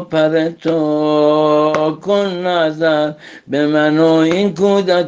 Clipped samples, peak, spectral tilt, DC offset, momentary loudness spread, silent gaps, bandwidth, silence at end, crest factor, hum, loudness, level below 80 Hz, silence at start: under 0.1%; 0 dBFS; -6.5 dB/octave; under 0.1%; 6 LU; none; 7.6 kHz; 0 s; 14 dB; none; -14 LUFS; -60 dBFS; 0 s